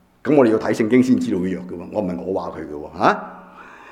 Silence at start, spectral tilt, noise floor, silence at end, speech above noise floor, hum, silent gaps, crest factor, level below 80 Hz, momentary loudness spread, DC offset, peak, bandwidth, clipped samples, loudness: 0.25 s; -7 dB/octave; -42 dBFS; 0 s; 23 dB; none; none; 18 dB; -56 dBFS; 14 LU; under 0.1%; 0 dBFS; 11.5 kHz; under 0.1%; -19 LUFS